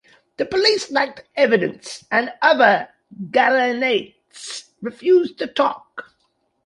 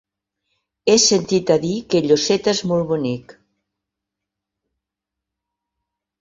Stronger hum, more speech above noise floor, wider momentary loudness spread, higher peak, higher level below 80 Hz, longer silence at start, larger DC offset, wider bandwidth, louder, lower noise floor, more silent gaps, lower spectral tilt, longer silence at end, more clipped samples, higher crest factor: neither; second, 49 dB vs 67 dB; first, 19 LU vs 10 LU; about the same, -2 dBFS vs -2 dBFS; second, -66 dBFS vs -58 dBFS; second, 0.4 s vs 0.85 s; neither; first, 11.5 kHz vs 8 kHz; about the same, -18 LUFS vs -17 LUFS; second, -68 dBFS vs -84 dBFS; neither; about the same, -3.5 dB/octave vs -4 dB/octave; second, 0.65 s vs 3 s; neither; about the same, 18 dB vs 20 dB